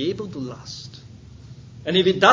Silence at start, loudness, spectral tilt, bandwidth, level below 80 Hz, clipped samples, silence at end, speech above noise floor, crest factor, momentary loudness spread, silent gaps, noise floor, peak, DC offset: 0 s; -22 LUFS; -5 dB/octave; 7.6 kHz; -52 dBFS; under 0.1%; 0 s; 23 dB; 22 dB; 24 LU; none; -43 dBFS; 0 dBFS; under 0.1%